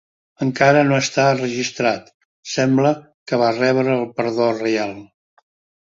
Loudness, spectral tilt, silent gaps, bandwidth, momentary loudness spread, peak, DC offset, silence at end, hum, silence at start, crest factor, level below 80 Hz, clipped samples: -18 LUFS; -5 dB/octave; 2.14-2.43 s, 3.14-3.26 s; 7.8 kHz; 12 LU; 0 dBFS; under 0.1%; 0.8 s; none; 0.4 s; 20 dB; -60 dBFS; under 0.1%